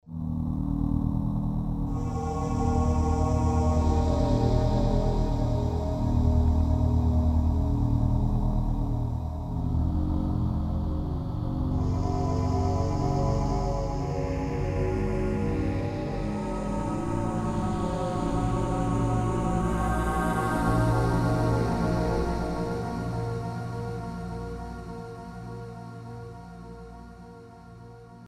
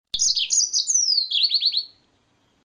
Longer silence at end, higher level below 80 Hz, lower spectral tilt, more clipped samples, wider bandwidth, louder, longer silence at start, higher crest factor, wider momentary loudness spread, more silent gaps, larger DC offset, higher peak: second, 0 s vs 0.8 s; first, -32 dBFS vs -62 dBFS; first, -8 dB/octave vs 5 dB/octave; neither; about the same, 12 kHz vs 11 kHz; second, -28 LUFS vs -18 LUFS; about the same, 0.05 s vs 0.15 s; about the same, 14 dB vs 16 dB; first, 15 LU vs 5 LU; neither; neither; second, -12 dBFS vs -6 dBFS